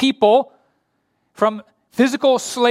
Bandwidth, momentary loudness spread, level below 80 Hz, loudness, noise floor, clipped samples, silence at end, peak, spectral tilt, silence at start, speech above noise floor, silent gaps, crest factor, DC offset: 15 kHz; 16 LU; -66 dBFS; -17 LUFS; -68 dBFS; under 0.1%; 0 s; -2 dBFS; -3.5 dB/octave; 0 s; 52 dB; none; 16 dB; under 0.1%